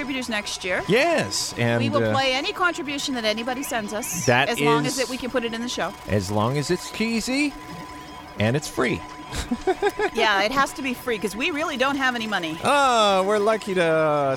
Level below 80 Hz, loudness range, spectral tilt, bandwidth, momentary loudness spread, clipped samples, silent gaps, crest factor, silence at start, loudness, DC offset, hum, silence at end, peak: -48 dBFS; 4 LU; -4 dB/octave; 18 kHz; 8 LU; under 0.1%; none; 18 dB; 0 s; -22 LUFS; under 0.1%; none; 0 s; -4 dBFS